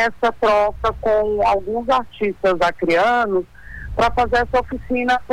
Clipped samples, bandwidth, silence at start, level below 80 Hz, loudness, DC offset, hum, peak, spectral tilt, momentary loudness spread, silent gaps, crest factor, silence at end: under 0.1%; 18 kHz; 0 s; -38 dBFS; -19 LUFS; under 0.1%; none; -10 dBFS; -5.5 dB/octave; 7 LU; none; 10 dB; 0 s